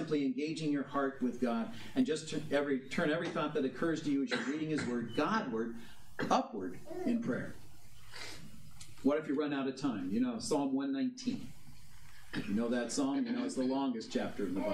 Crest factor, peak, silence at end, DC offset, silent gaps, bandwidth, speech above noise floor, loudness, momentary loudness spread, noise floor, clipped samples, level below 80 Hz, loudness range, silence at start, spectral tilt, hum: 20 dB; -16 dBFS; 0 s; 0.3%; none; 14 kHz; 23 dB; -35 LUFS; 11 LU; -58 dBFS; under 0.1%; -68 dBFS; 3 LU; 0 s; -5 dB/octave; none